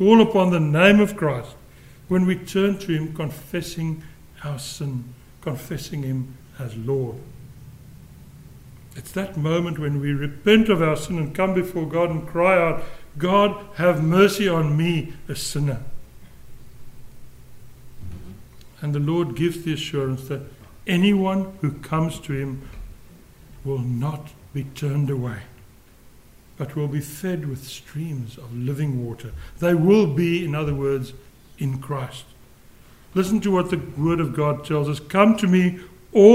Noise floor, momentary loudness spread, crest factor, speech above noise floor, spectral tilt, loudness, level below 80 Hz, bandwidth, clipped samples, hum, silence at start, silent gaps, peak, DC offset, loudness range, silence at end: -49 dBFS; 18 LU; 22 dB; 27 dB; -6.5 dB/octave; -22 LUFS; -46 dBFS; 16 kHz; under 0.1%; none; 0 s; none; 0 dBFS; under 0.1%; 11 LU; 0 s